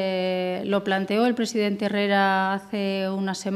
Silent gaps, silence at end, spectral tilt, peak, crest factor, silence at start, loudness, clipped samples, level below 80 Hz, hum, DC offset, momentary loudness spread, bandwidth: none; 0 s; -5.5 dB/octave; -8 dBFS; 16 dB; 0 s; -24 LUFS; under 0.1%; -70 dBFS; none; under 0.1%; 6 LU; 14 kHz